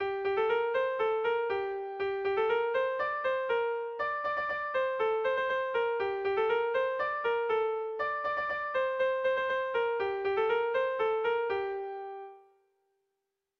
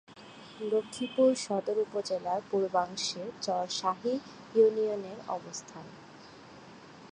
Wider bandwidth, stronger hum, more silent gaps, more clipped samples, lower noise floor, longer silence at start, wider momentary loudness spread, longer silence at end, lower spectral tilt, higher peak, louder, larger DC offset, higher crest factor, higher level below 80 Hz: second, 6.4 kHz vs 11 kHz; neither; neither; neither; first, -85 dBFS vs -51 dBFS; about the same, 0 s vs 0.1 s; second, 5 LU vs 25 LU; first, 1.2 s vs 0 s; about the same, -5 dB/octave vs -4 dB/octave; second, -18 dBFS vs -12 dBFS; about the same, -31 LUFS vs -31 LUFS; neither; second, 12 dB vs 20 dB; first, -68 dBFS vs -76 dBFS